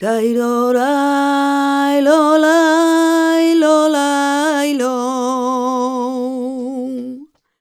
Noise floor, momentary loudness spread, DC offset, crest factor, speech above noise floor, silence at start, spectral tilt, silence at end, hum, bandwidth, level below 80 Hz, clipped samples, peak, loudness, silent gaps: -35 dBFS; 11 LU; under 0.1%; 14 dB; 22 dB; 0 s; -3 dB/octave; 0.35 s; none; 15.5 kHz; -70 dBFS; under 0.1%; 0 dBFS; -15 LUFS; none